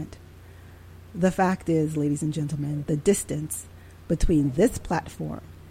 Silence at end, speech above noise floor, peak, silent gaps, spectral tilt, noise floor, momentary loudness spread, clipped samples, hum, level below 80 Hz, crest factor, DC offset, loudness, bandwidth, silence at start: 0 s; 22 dB; -8 dBFS; none; -6.5 dB/octave; -46 dBFS; 12 LU; under 0.1%; none; -38 dBFS; 18 dB; under 0.1%; -26 LUFS; 16.5 kHz; 0 s